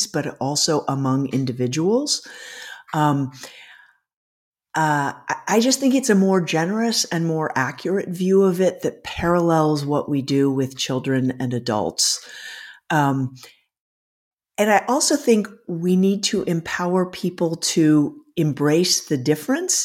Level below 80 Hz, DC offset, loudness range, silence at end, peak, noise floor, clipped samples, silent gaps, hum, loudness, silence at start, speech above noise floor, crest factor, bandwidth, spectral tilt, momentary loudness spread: -58 dBFS; under 0.1%; 4 LU; 0 s; -4 dBFS; -50 dBFS; under 0.1%; 4.16-4.52 s, 13.79-14.37 s; none; -20 LUFS; 0 s; 30 dB; 16 dB; 16.5 kHz; -4.5 dB/octave; 10 LU